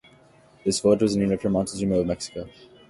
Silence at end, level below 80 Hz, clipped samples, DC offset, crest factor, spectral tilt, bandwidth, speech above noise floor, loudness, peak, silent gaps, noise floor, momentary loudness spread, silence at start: 0.4 s; -50 dBFS; under 0.1%; under 0.1%; 18 dB; -5.5 dB/octave; 11.5 kHz; 31 dB; -24 LUFS; -6 dBFS; none; -55 dBFS; 14 LU; 0.65 s